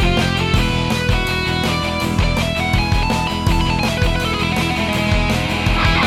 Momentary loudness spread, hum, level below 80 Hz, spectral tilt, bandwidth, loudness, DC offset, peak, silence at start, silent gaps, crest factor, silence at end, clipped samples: 2 LU; none; -24 dBFS; -5 dB/octave; 16 kHz; -17 LUFS; under 0.1%; -2 dBFS; 0 s; none; 14 dB; 0 s; under 0.1%